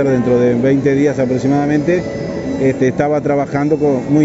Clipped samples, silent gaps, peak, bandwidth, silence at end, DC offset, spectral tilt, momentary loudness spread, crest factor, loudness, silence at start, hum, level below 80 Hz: under 0.1%; none; 0 dBFS; 8 kHz; 0 s; under 0.1%; -8 dB/octave; 4 LU; 14 dB; -15 LUFS; 0 s; none; -44 dBFS